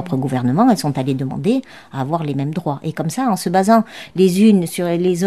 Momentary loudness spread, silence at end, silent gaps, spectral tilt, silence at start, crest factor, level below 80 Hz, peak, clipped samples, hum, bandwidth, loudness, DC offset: 10 LU; 0 s; none; -6.5 dB/octave; 0 s; 16 dB; -58 dBFS; -2 dBFS; under 0.1%; none; 14.5 kHz; -17 LUFS; 0.3%